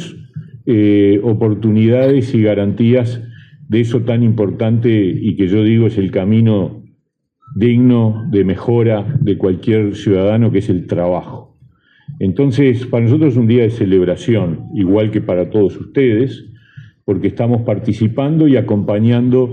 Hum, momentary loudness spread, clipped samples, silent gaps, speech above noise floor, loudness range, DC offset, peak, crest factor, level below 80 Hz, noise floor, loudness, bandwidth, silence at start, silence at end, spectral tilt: none; 7 LU; under 0.1%; none; 50 dB; 3 LU; under 0.1%; 0 dBFS; 12 dB; -54 dBFS; -63 dBFS; -14 LUFS; 7.2 kHz; 0 s; 0 s; -9.5 dB/octave